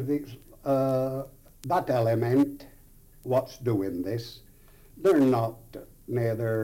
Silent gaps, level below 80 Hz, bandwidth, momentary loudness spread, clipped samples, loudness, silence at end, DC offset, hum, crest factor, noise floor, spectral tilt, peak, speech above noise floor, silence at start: none; -56 dBFS; 17 kHz; 20 LU; under 0.1%; -27 LUFS; 0 s; under 0.1%; none; 14 dB; -53 dBFS; -8 dB/octave; -12 dBFS; 27 dB; 0 s